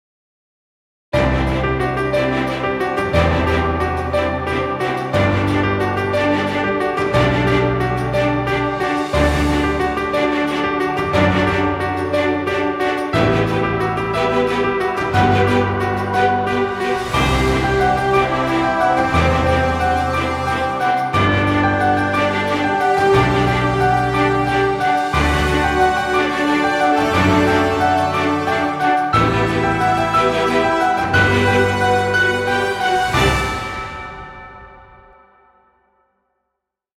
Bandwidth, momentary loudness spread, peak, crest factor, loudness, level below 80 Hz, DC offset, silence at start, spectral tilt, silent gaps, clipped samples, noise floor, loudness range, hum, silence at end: 15.5 kHz; 4 LU; -2 dBFS; 16 dB; -17 LUFS; -32 dBFS; under 0.1%; 1.15 s; -6 dB/octave; none; under 0.1%; -78 dBFS; 3 LU; none; 2.2 s